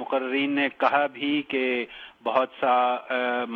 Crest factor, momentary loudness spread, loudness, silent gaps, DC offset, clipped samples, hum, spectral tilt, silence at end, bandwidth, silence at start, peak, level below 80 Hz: 20 dB; 5 LU; -25 LUFS; none; under 0.1%; under 0.1%; none; -6 dB/octave; 0 s; 5.8 kHz; 0 s; -6 dBFS; -74 dBFS